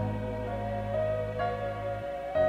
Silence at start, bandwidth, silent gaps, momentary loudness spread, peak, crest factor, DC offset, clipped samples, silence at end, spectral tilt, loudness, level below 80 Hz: 0 s; 10.5 kHz; none; 4 LU; -16 dBFS; 14 dB; under 0.1%; under 0.1%; 0 s; -8 dB/octave; -33 LUFS; -46 dBFS